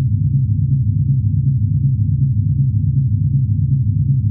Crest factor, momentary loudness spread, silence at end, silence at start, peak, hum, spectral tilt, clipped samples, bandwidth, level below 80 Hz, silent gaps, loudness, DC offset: 10 dB; 0 LU; 0 s; 0 s; -6 dBFS; none; -17.5 dB/octave; under 0.1%; 0.5 kHz; -32 dBFS; none; -16 LUFS; under 0.1%